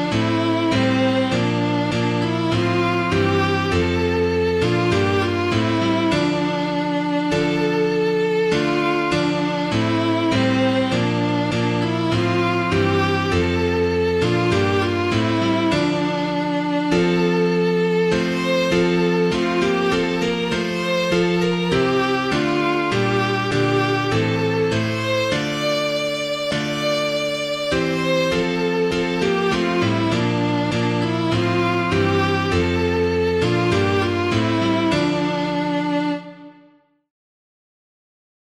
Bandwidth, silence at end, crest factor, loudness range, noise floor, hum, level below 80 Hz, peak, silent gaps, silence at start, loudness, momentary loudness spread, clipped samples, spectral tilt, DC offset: 14 kHz; 2.1 s; 14 dB; 2 LU; -55 dBFS; none; -44 dBFS; -6 dBFS; none; 0 s; -19 LUFS; 3 LU; under 0.1%; -6 dB/octave; under 0.1%